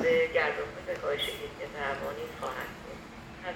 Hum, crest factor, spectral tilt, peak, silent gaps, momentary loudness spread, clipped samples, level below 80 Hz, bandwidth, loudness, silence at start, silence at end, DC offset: none; 18 dB; -4 dB/octave; -14 dBFS; none; 17 LU; under 0.1%; -56 dBFS; 18 kHz; -33 LUFS; 0 s; 0 s; under 0.1%